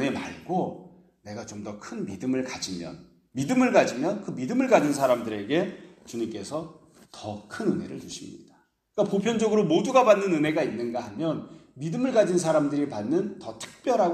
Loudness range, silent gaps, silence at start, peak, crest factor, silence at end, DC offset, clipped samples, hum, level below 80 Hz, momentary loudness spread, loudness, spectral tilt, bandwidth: 8 LU; none; 0 s; -4 dBFS; 22 dB; 0 s; under 0.1%; under 0.1%; none; -66 dBFS; 17 LU; -26 LUFS; -5.5 dB/octave; 14.5 kHz